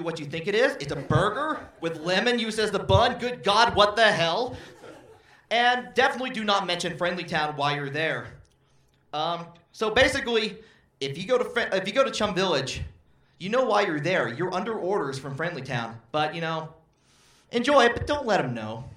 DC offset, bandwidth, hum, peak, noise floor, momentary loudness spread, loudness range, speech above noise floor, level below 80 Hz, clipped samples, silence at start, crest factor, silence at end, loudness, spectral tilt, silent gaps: under 0.1%; 15 kHz; none; -4 dBFS; -63 dBFS; 13 LU; 5 LU; 38 dB; -52 dBFS; under 0.1%; 0 s; 22 dB; 0 s; -25 LUFS; -4.5 dB/octave; none